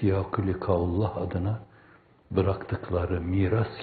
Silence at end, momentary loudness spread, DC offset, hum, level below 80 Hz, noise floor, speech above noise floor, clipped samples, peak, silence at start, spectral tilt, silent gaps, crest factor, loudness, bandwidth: 0 s; 5 LU; under 0.1%; none; -50 dBFS; -57 dBFS; 30 dB; under 0.1%; -10 dBFS; 0 s; -8 dB/octave; none; 18 dB; -28 LUFS; 4.7 kHz